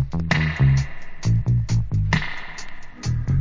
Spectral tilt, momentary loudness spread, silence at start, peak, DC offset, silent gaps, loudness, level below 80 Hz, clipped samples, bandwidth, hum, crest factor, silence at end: -6 dB/octave; 15 LU; 0 s; -2 dBFS; under 0.1%; none; -22 LUFS; -30 dBFS; under 0.1%; 7.6 kHz; none; 18 dB; 0 s